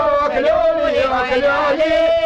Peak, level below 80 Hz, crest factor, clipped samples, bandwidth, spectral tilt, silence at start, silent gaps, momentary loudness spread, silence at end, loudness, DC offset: -8 dBFS; -40 dBFS; 8 dB; under 0.1%; 8.4 kHz; -5 dB/octave; 0 s; none; 2 LU; 0 s; -16 LUFS; under 0.1%